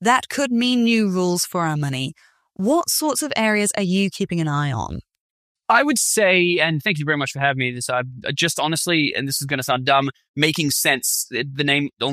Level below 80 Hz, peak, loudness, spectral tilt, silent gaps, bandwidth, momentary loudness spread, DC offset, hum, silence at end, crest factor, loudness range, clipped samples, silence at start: -54 dBFS; 0 dBFS; -19 LUFS; -3.5 dB/octave; 5.20-5.55 s, 10.29-10.34 s; 15.5 kHz; 8 LU; under 0.1%; none; 0 s; 20 dB; 2 LU; under 0.1%; 0 s